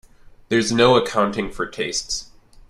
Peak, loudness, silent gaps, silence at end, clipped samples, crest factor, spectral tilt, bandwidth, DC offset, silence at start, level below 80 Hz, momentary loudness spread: -2 dBFS; -20 LUFS; none; 0.45 s; under 0.1%; 18 dB; -4 dB/octave; 13 kHz; under 0.1%; 0.25 s; -46 dBFS; 12 LU